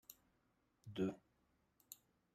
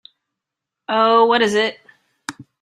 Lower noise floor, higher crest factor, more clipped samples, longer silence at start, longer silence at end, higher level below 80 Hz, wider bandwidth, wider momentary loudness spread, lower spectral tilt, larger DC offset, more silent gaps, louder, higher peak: about the same, -81 dBFS vs -83 dBFS; about the same, 22 dB vs 18 dB; neither; second, 0.1 s vs 0.9 s; first, 0.4 s vs 0.2 s; second, -82 dBFS vs -66 dBFS; first, 15.5 kHz vs 12.5 kHz; about the same, 19 LU vs 20 LU; first, -6 dB/octave vs -3.5 dB/octave; neither; neither; second, -46 LUFS vs -16 LUFS; second, -30 dBFS vs -2 dBFS